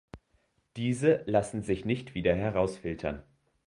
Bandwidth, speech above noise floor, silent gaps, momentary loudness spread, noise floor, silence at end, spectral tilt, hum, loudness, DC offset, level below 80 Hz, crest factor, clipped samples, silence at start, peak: 11.5 kHz; 43 dB; none; 10 LU; -72 dBFS; 0.45 s; -6.5 dB/octave; none; -30 LUFS; under 0.1%; -52 dBFS; 20 dB; under 0.1%; 0.15 s; -10 dBFS